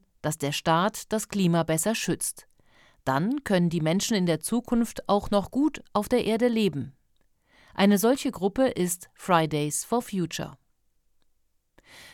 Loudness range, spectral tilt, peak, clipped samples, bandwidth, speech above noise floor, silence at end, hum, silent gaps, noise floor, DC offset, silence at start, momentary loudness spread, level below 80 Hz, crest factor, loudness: 2 LU; -5 dB/octave; -8 dBFS; under 0.1%; 18 kHz; 43 dB; 0.05 s; none; none; -68 dBFS; under 0.1%; 0.25 s; 8 LU; -54 dBFS; 18 dB; -26 LUFS